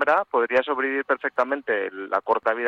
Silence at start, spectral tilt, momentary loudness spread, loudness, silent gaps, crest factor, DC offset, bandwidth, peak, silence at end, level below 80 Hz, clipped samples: 0 s; -5 dB/octave; 5 LU; -24 LUFS; none; 16 dB; under 0.1%; 7.6 kHz; -8 dBFS; 0 s; -70 dBFS; under 0.1%